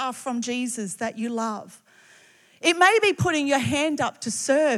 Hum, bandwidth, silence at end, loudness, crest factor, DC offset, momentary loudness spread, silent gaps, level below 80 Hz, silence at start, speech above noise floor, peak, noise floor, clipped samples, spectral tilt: none; 15 kHz; 0 s; -23 LUFS; 18 dB; under 0.1%; 12 LU; none; -64 dBFS; 0 s; 32 dB; -6 dBFS; -55 dBFS; under 0.1%; -3.5 dB/octave